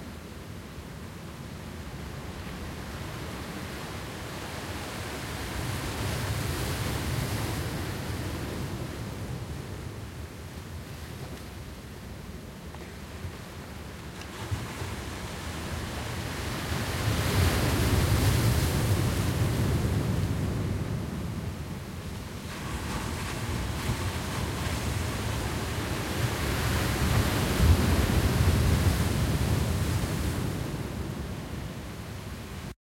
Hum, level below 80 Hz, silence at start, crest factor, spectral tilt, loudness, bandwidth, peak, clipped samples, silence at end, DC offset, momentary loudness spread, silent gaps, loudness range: none; -38 dBFS; 0 s; 20 dB; -5 dB/octave; -31 LUFS; 16.5 kHz; -10 dBFS; under 0.1%; 0.1 s; under 0.1%; 16 LU; none; 13 LU